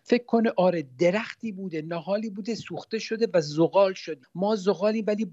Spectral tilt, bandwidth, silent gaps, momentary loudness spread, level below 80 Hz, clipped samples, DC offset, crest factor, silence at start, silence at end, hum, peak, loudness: -6 dB/octave; 8 kHz; none; 12 LU; -76 dBFS; under 0.1%; under 0.1%; 18 dB; 0.1 s; 0 s; none; -8 dBFS; -26 LUFS